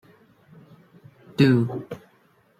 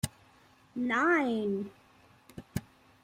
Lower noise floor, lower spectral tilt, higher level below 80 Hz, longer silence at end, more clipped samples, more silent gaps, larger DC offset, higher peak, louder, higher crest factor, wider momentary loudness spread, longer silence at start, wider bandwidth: about the same, -61 dBFS vs -62 dBFS; first, -8 dB/octave vs -5.5 dB/octave; about the same, -64 dBFS vs -60 dBFS; first, 0.6 s vs 0.45 s; neither; neither; neither; first, -4 dBFS vs -14 dBFS; first, -21 LUFS vs -31 LUFS; about the same, 22 dB vs 20 dB; about the same, 21 LU vs 19 LU; first, 1.4 s vs 0.05 s; second, 14.5 kHz vs 16 kHz